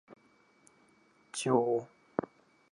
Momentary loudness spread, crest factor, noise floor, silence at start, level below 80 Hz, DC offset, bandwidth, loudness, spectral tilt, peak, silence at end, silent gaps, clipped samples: 13 LU; 22 dB; -66 dBFS; 0.1 s; -82 dBFS; under 0.1%; 11.5 kHz; -33 LUFS; -5 dB/octave; -14 dBFS; 0.45 s; none; under 0.1%